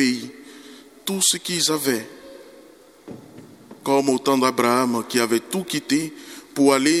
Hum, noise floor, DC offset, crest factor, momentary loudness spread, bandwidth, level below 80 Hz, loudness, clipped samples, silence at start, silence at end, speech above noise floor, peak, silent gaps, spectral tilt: none; -48 dBFS; under 0.1%; 20 dB; 23 LU; 16 kHz; -68 dBFS; -21 LUFS; under 0.1%; 0 s; 0 s; 28 dB; -2 dBFS; none; -3 dB/octave